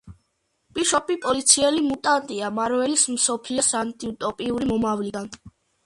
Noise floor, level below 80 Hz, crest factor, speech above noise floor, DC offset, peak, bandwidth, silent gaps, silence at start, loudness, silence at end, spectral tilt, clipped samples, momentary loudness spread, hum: -72 dBFS; -56 dBFS; 22 dB; 49 dB; under 0.1%; -2 dBFS; 11.5 kHz; none; 0.05 s; -22 LUFS; 0.35 s; -2 dB/octave; under 0.1%; 12 LU; none